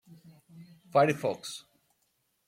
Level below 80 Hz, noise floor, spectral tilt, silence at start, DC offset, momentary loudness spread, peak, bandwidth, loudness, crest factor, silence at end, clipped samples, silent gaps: -76 dBFS; -76 dBFS; -5.5 dB/octave; 0.1 s; under 0.1%; 17 LU; -10 dBFS; 16.5 kHz; -28 LUFS; 22 dB; 0.9 s; under 0.1%; none